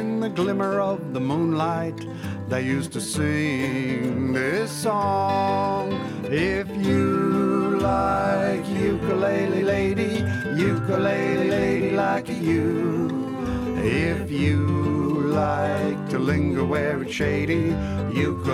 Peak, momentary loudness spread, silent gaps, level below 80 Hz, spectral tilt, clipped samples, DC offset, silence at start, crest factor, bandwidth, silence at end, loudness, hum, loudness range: -10 dBFS; 5 LU; none; -44 dBFS; -6.5 dB/octave; under 0.1%; under 0.1%; 0 s; 14 dB; 15 kHz; 0 s; -23 LUFS; none; 3 LU